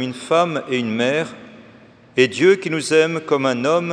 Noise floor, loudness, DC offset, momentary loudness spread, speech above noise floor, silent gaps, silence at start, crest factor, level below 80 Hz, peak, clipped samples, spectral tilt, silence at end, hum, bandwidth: -46 dBFS; -18 LUFS; under 0.1%; 7 LU; 28 dB; none; 0 s; 18 dB; -68 dBFS; 0 dBFS; under 0.1%; -5 dB/octave; 0 s; none; 10.5 kHz